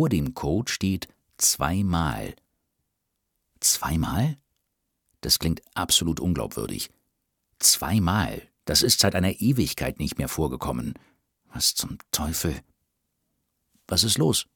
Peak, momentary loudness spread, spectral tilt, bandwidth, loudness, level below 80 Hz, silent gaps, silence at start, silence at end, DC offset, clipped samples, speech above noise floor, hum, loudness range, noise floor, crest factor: -4 dBFS; 13 LU; -3.5 dB/octave; 19 kHz; -24 LUFS; -42 dBFS; none; 0 s; 0.15 s; under 0.1%; under 0.1%; 54 dB; none; 6 LU; -79 dBFS; 22 dB